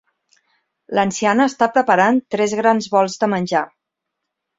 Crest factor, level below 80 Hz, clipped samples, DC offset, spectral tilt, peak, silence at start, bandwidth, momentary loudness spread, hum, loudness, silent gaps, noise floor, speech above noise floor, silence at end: 18 dB; -64 dBFS; under 0.1%; under 0.1%; -5 dB/octave; 0 dBFS; 0.9 s; 8 kHz; 6 LU; none; -17 LUFS; none; -79 dBFS; 63 dB; 0.95 s